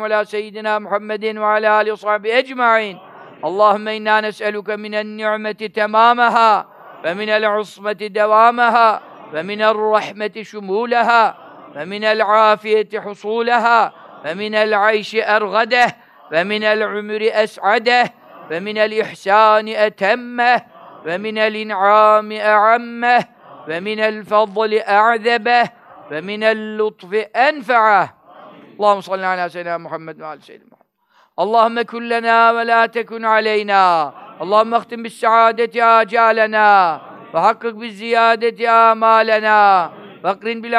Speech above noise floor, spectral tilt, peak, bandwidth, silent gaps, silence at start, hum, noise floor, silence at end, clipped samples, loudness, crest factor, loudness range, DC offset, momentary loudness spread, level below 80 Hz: 41 dB; -4.5 dB/octave; 0 dBFS; 11.5 kHz; none; 0 s; none; -57 dBFS; 0 s; under 0.1%; -15 LUFS; 16 dB; 4 LU; under 0.1%; 13 LU; -78 dBFS